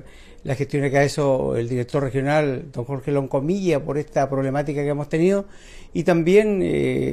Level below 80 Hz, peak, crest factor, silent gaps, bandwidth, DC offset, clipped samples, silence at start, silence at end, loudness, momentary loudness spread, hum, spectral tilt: -44 dBFS; -6 dBFS; 16 dB; none; 13 kHz; under 0.1%; under 0.1%; 0.05 s; 0 s; -21 LUFS; 10 LU; none; -7 dB/octave